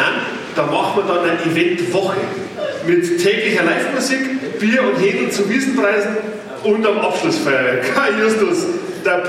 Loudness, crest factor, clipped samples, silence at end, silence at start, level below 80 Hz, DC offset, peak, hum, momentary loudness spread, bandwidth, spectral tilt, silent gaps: -17 LUFS; 14 dB; under 0.1%; 0 s; 0 s; -64 dBFS; under 0.1%; -2 dBFS; none; 7 LU; 15.5 kHz; -4.5 dB/octave; none